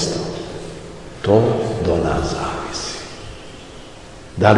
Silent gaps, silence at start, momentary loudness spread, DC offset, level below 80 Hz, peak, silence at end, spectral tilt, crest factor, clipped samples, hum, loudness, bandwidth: none; 0 s; 21 LU; 0.5%; -38 dBFS; 0 dBFS; 0 s; -5.5 dB/octave; 20 dB; under 0.1%; none; -20 LUFS; 11.5 kHz